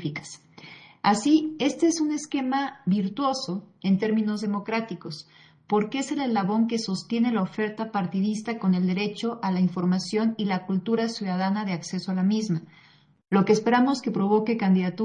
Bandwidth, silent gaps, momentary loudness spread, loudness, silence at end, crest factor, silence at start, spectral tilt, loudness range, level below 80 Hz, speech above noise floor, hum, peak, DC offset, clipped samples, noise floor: 10.5 kHz; none; 8 LU; -25 LUFS; 0 s; 18 dB; 0 s; -6 dB/octave; 2 LU; -72 dBFS; 23 dB; none; -6 dBFS; under 0.1%; under 0.1%; -48 dBFS